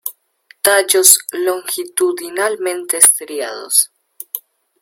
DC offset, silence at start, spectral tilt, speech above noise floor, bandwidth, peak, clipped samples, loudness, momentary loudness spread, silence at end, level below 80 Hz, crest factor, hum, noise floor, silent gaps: under 0.1%; 0.05 s; 1 dB/octave; 35 dB; over 20 kHz; 0 dBFS; 0.2%; -13 LUFS; 19 LU; 0.45 s; -68 dBFS; 16 dB; none; -50 dBFS; none